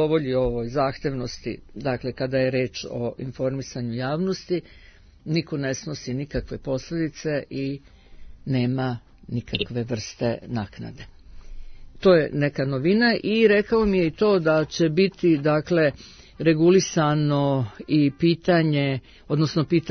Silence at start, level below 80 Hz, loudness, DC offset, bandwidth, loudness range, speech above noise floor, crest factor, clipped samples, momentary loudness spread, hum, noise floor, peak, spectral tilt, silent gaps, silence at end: 0 s; -46 dBFS; -23 LUFS; under 0.1%; 6.6 kHz; 8 LU; 19 dB; 18 dB; under 0.1%; 12 LU; none; -42 dBFS; -6 dBFS; -6.5 dB/octave; none; 0 s